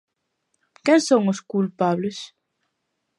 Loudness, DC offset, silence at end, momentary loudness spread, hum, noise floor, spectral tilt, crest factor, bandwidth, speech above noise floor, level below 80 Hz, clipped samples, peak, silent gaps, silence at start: -21 LUFS; under 0.1%; 0.95 s; 15 LU; none; -76 dBFS; -5.5 dB/octave; 18 dB; 11.5 kHz; 56 dB; -74 dBFS; under 0.1%; -6 dBFS; none; 0.85 s